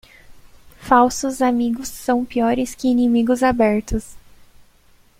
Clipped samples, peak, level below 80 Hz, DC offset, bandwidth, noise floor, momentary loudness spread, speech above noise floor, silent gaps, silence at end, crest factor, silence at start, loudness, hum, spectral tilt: under 0.1%; -2 dBFS; -40 dBFS; under 0.1%; 16 kHz; -53 dBFS; 9 LU; 35 dB; none; 1 s; 18 dB; 0.3 s; -18 LUFS; none; -5 dB/octave